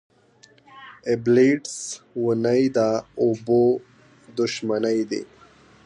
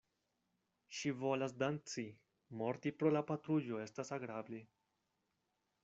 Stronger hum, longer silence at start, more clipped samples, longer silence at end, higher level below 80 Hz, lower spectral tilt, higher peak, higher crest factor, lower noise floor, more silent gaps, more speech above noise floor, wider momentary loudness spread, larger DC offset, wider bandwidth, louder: neither; second, 0.75 s vs 0.9 s; neither; second, 0.6 s vs 1.2 s; first, -64 dBFS vs -84 dBFS; about the same, -5.5 dB/octave vs -6 dB/octave; first, -6 dBFS vs -22 dBFS; about the same, 16 dB vs 20 dB; second, -55 dBFS vs -86 dBFS; neither; second, 34 dB vs 45 dB; about the same, 14 LU vs 14 LU; neither; first, 11 kHz vs 8 kHz; first, -22 LUFS vs -41 LUFS